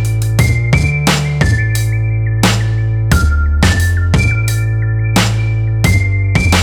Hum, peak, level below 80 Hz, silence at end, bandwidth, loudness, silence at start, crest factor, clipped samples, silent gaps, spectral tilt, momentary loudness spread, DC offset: none; 0 dBFS; -20 dBFS; 0 s; 17 kHz; -13 LUFS; 0 s; 12 dB; under 0.1%; none; -5 dB/octave; 3 LU; under 0.1%